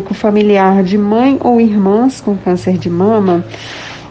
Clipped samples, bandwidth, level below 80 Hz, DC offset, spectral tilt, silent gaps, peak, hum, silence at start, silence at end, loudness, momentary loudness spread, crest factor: under 0.1%; 8.8 kHz; -46 dBFS; under 0.1%; -7.5 dB/octave; none; 0 dBFS; none; 0 s; 0 s; -11 LUFS; 10 LU; 10 dB